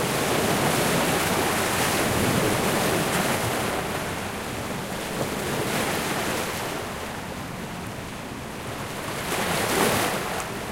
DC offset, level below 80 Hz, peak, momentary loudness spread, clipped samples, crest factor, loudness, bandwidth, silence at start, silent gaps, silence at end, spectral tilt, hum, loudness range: under 0.1%; -46 dBFS; -10 dBFS; 11 LU; under 0.1%; 16 dB; -25 LUFS; 16 kHz; 0 s; none; 0 s; -3.5 dB/octave; none; 7 LU